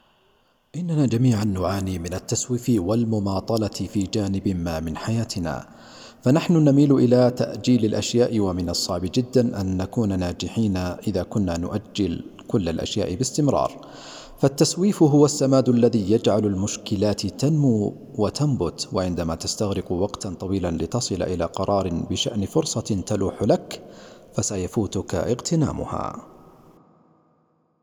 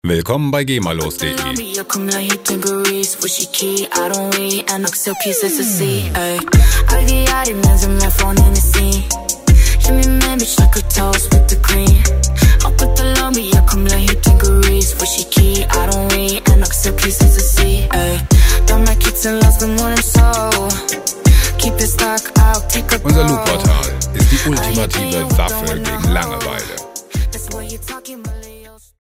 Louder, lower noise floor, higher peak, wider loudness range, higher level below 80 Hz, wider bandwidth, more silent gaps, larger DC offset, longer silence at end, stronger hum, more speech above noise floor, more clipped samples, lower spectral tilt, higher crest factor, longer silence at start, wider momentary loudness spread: second, -23 LUFS vs -14 LUFS; first, -65 dBFS vs -39 dBFS; second, -4 dBFS vs 0 dBFS; about the same, 6 LU vs 4 LU; second, -48 dBFS vs -14 dBFS; first, 18.5 kHz vs 16.5 kHz; neither; neither; first, 1.55 s vs 0.4 s; neither; first, 43 dB vs 26 dB; neither; first, -6 dB/octave vs -4 dB/octave; first, 18 dB vs 12 dB; first, 0.75 s vs 0.05 s; first, 10 LU vs 7 LU